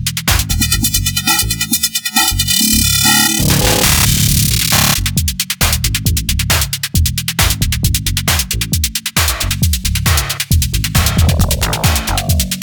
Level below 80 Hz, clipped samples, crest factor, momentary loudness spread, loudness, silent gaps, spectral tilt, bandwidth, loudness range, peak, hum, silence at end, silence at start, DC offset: -22 dBFS; under 0.1%; 14 dB; 6 LU; -12 LUFS; none; -2.5 dB/octave; over 20 kHz; 4 LU; 0 dBFS; none; 0 s; 0 s; under 0.1%